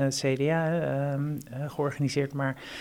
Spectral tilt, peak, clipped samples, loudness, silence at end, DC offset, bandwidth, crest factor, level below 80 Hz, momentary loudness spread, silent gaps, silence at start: -6 dB/octave; -14 dBFS; under 0.1%; -29 LUFS; 0 s; under 0.1%; 15.5 kHz; 16 dB; -62 dBFS; 7 LU; none; 0 s